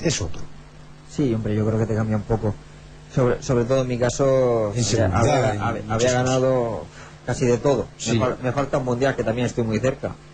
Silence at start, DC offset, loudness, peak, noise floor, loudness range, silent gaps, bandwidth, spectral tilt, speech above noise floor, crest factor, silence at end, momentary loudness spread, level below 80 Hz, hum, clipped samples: 0 s; under 0.1%; -22 LUFS; -8 dBFS; -43 dBFS; 3 LU; none; 9.4 kHz; -5.5 dB/octave; 21 dB; 14 dB; 0 s; 9 LU; -40 dBFS; none; under 0.1%